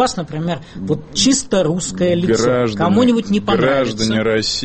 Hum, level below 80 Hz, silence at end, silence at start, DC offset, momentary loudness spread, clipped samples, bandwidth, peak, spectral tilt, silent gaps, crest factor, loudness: none; -42 dBFS; 0 s; 0 s; under 0.1%; 9 LU; under 0.1%; 8.8 kHz; -2 dBFS; -4.5 dB/octave; none; 14 dB; -16 LUFS